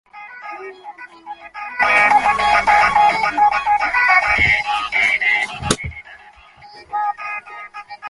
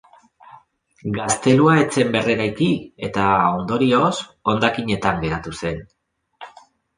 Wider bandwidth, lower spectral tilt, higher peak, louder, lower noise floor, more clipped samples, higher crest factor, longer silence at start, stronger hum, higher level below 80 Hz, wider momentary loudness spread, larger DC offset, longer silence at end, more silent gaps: about the same, 11.5 kHz vs 10.5 kHz; second, -2.5 dB/octave vs -5 dB/octave; about the same, 0 dBFS vs -2 dBFS; first, -15 LUFS vs -19 LUFS; second, -44 dBFS vs -50 dBFS; neither; about the same, 18 dB vs 18 dB; second, 0.15 s vs 1.05 s; neither; first, -42 dBFS vs -48 dBFS; first, 22 LU vs 12 LU; neither; second, 0 s vs 0.5 s; neither